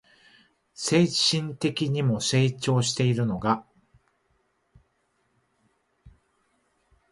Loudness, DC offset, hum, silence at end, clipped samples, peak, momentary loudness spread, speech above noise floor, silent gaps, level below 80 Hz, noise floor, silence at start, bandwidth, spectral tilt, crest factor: -24 LUFS; under 0.1%; none; 1.05 s; under 0.1%; -8 dBFS; 6 LU; 47 dB; none; -60 dBFS; -71 dBFS; 0.8 s; 11.5 kHz; -5 dB/octave; 20 dB